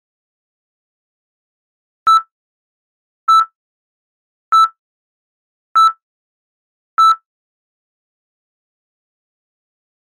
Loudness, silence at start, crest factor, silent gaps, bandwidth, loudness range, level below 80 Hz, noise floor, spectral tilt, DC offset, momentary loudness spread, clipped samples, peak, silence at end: -14 LUFS; 2.05 s; 14 dB; 2.32-3.27 s, 3.55-4.52 s, 4.79-5.75 s, 6.03-6.97 s; 15.5 kHz; 4 LU; -74 dBFS; under -90 dBFS; 2 dB/octave; under 0.1%; 9 LU; under 0.1%; -6 dBFS; 2.9 s